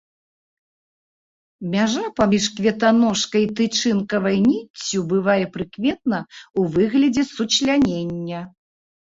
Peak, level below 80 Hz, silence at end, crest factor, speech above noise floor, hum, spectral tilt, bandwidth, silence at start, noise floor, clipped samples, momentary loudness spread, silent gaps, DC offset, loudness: -4 dBFS; -54 dBFS; 0.7 s; 16 dB; over 70 dB; none; -4.5 dB/octave; 8 kHz; 1.6 s; under -90 dBFS; under 0.1%; 10 LU; 4.70-4.74 s, 6.50-6.54 s; under 0.1%; -20 LUFS